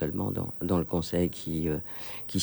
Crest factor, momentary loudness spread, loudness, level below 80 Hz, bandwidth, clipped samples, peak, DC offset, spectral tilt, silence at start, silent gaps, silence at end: 16 dB; 5 LU; -31 LUFS; -50 dBFS; over 20 kHz; under 0.1%; -14 dBFS; under 0.1%; -6 dB/octave; 0 s; none; 0 s